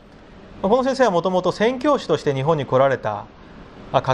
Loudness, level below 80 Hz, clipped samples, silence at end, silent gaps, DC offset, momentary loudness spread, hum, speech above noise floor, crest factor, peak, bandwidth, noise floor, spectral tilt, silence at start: -20 LUFS; -50 dBFS; under 0.1%; 0 s; none; under 0.1%; 7 LU; none; 25 dB; 18 dB; -2 dBFS; 10 kHz; -44 dBFS; -6 dB/octave; 0.3 s